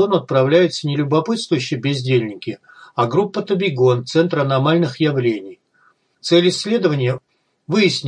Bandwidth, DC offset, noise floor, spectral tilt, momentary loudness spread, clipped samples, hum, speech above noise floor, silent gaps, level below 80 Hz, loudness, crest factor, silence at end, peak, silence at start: 10 kHz; under 0.1%; -58 dBFS; -6 dB/octave; 12 LU; under 0.1%; none; 41 dB; none; -66 dBFS; -18 LUFS; 16 dB; 0 s; -2 dBFS; 0 s